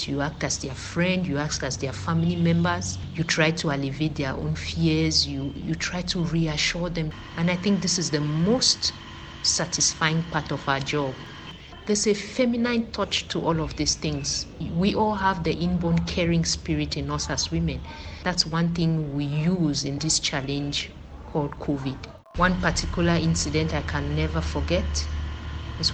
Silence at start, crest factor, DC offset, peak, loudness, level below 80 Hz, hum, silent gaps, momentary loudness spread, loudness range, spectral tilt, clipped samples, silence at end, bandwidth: 0 s; 20 dB; under 0.1%; -6 dBFS; -25 LUFS; -38 dBFS; none; none; 9 LU; 2 LU; -4 dB/octave; under 0.1%; 0 s; 9.2 kHz